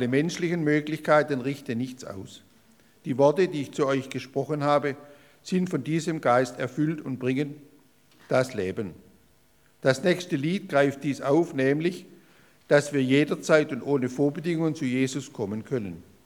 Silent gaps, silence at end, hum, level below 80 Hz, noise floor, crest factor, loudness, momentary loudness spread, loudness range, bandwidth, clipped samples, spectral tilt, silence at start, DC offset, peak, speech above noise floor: none; 0.25 s; none; -72 dBFS; -63 dBFS; 20 dB; -26 LUFS; 10 LU; 4 LU; 18 kHz; under 0.1%; -6 dB/octave; 0 s; under 0.1%; -6 dBFS; 37 dB